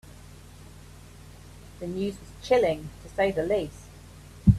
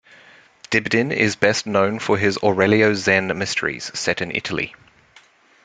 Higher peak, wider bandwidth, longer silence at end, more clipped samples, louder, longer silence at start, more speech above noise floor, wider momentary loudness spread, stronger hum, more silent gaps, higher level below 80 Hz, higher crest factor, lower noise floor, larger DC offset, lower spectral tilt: second, -6 dBFS vs 0 dBFS; first, 14 kHz vs 9.4 kHz; second, 0 s vs 0.95 s; neither; second, -28 LUFS vs -19 LUFS; second, 0.05 s vs 0.7 s; second, 20 dB vs 33 dB; first, 25 LU vs 8 LU; neither; neither; first, -42 dBFS vs -58 dBFS; about the same, 22 dB vs 20 dB; second, -47 dBFS vs -52 dBFS; neither; first, -7.5 dB/octave vs -4.5 dB/octave